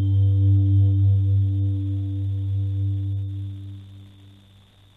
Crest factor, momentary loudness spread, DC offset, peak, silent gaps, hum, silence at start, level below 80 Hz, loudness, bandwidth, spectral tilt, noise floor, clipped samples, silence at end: 10 dB; 15 LU; under 0.1%; -12 dBFS; none; 50 Hz at -55 dBFS; 0 s; -58 dBFS; -22 LUFS; 3.8 kHz; -11 dB/octave; -52 dBFS; under 0.1%; 0.9 s